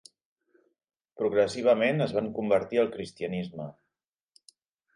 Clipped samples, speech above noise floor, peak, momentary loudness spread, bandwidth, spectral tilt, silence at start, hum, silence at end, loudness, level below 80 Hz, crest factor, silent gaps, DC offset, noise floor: under 0.1%; 60 dB; -10 dBFS; 13 LU; 11 kHz; -6 dB/octave; 1.2 s; none; 1.25 s; -27 LUFS; -66 dBFS; 18 dB; none; under 0.1%; -87 dBFS